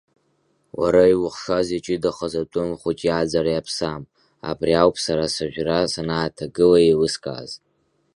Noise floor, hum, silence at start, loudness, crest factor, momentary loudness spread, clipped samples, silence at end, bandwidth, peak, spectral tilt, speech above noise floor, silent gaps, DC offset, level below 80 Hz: -66 dBFS; none; 0.75 s; -21 LUFS; 20 dB; 15 LU; under 0.1%; 0.6 s; 11.5 kHz; -2 dBFS; -5 dB/octave; 46 dB; none; under 0.1%; -48 dBFS